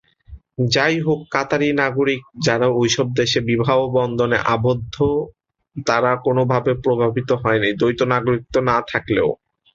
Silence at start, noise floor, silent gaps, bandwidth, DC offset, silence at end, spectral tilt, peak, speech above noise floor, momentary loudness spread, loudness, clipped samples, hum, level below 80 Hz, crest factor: 0.3 s; -43 dBFS; none; 7.8 kHz; under 0.1%; 0.4 s; -5.5 dB/octave; -2 dBFS; 25 dB; 4 LU; -19 LUFS; under 0.1%; none; -46 dBFS; 16 dB